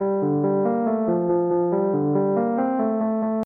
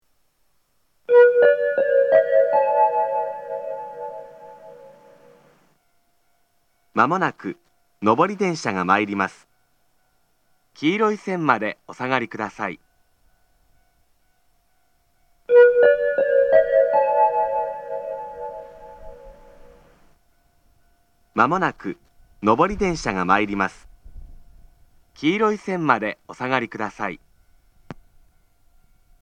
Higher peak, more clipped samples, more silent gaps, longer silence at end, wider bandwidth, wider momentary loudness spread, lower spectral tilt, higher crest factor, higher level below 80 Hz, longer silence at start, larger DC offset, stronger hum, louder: second, -10 dBFS vs 0 dBFS; neither; neither; second, 0 s vs 1.3 s; second, 2.7 kHz vs 9.2 kHz; second, 1 LU vs 18 LU; first, -12.5 dB/octave vs -6 dB/octave; second, 12 dB vs 22 dB; second, -66 dBFS vs -52 dBFS; second, 0 s vs 1.1 s; neither; neither; about the same, -22 LUFS vs -20 LUFS